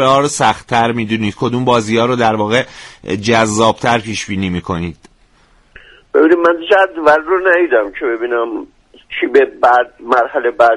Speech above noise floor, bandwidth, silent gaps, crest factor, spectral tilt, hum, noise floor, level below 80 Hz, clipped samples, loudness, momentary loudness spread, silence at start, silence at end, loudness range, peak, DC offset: 37 dB; 11.5 kHz; none; 14 dB; -4.5 dB/octave; none; -50 dBFS; -46 dBFS; under 0.1%; -13 LUFS; 9 LU; 0 s; 0 s; 3 LU; 0 dBFS; under 0.1%